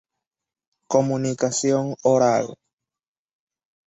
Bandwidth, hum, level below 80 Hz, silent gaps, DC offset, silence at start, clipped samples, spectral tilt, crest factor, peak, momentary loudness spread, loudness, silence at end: 8.2 kHz; none; -66 dBFS; none; under 0.1%; 0.9 s; under 0.1%; -5 dB/octave; 20 dB; -4 dBFS; 5 LU; -21 LUFS; 1.35 s